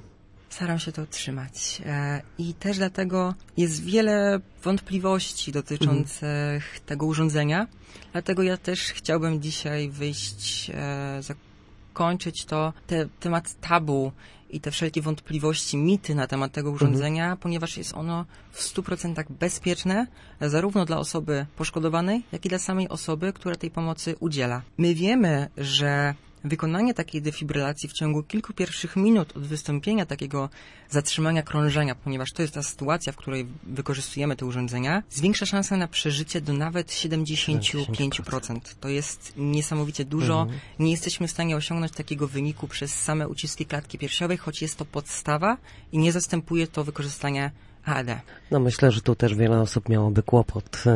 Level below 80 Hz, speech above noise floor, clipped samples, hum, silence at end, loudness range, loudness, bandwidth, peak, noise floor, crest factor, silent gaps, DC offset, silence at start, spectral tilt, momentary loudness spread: -50 dBFS; 25 dB; under 0.1%; none; 0 s; 4 LU; -26 LUFS; 11.5 kHz; -4 dBFS; -51 dBFS; 20 dB; none; under 0.1%; 0.05 s; -5 dB/octave; 9 LU